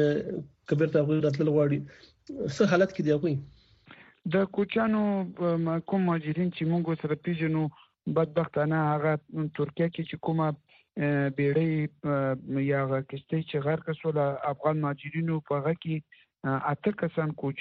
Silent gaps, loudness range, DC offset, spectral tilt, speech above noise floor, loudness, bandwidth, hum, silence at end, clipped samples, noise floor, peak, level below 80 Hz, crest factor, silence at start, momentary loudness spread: none; 3 LU; under 0.1%; -7 dB/octave; 27 dB; -29 LUFS; 7.6 kHz; none; 0 s; under 0.1%; -55 dBFS; -10 dBFS; -66 dBFS; 18 dB; 0 s; 8 LU